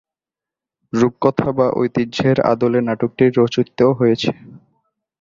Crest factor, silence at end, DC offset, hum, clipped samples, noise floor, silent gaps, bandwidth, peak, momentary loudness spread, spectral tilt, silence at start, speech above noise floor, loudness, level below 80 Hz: 16 dB; 0.65 s; under 0.1%; none; under 0.1%; -88 dBFS; none; 7.6 kHz; -2 dBFS; 6 LU; -7 dB/octave; 0.95 s; 72 dB; -17 LUFS; -52 dBFS